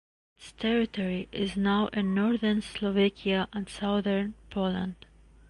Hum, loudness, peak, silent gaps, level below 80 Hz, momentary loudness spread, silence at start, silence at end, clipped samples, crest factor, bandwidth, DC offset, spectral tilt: none; -29 LUFS; -14 dBFS; none; -54 dBFS; 7 LU; 0.4 s; 0.55 s; under 0.1%; 16 dB; 11 kHz; under 0.1%; -6.5 dB/octave